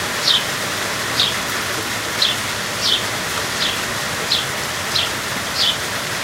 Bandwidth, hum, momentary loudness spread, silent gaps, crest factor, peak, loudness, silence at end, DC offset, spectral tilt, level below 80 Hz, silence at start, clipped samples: 16 kHz; none; 5 LU; none; 20 dB; -2 dBFS; -18 LUFS; 0 s; under 0.1%; -1.5 dB/octave; -48 dBFS; 0 s; under 0.1%